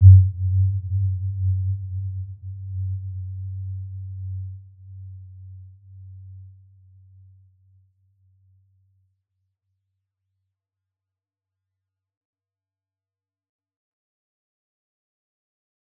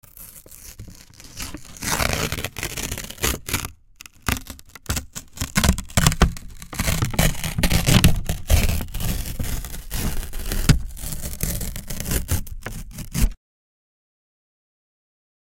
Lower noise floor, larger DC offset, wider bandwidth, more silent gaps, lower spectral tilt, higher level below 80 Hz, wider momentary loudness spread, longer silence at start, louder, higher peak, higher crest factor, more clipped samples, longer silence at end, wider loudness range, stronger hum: first, under -90 dBFS vs -46 dBFS; neither; second, 0.2 kHz vs 17 kHz; neither; first, -17 dB/octave vs -4 dB/octave; second, -58 dBFS vs -28 dBFS; first, 22 LU vs 19 LU; second, 0 s vs 0.15 s; about the same, -24 LUFS vs -24 LUFS; about the same, -2 dBFS vs -2 dBFS; about the same, 24 dB vs 22 dB; neither; first, 9.5 s vs 2.05 s; first, 22 LU vs 8 LU; neither